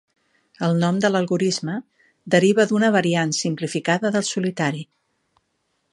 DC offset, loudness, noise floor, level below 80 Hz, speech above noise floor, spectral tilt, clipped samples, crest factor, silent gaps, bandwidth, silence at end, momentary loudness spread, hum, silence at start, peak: under 0.1%; -20 LUFS; -71 dBFS; -68 dBFS; 51 dB; -5 dB/octave; under 0.1%; 20 dB; none; 11.5 kHz; 1.1 s; 8 LU; none; 0.6 s; -2 dBFS